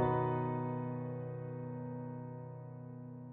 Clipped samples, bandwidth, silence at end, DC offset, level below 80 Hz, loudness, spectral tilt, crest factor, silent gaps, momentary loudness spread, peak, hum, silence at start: under 0.1%; 3.8 kHz; 0 s; under 0.1%; -66 dBFS; -41 LUFS; -9 dB/octave; 18 dB; none; 14 LU; -20 dBFS; none; 0 s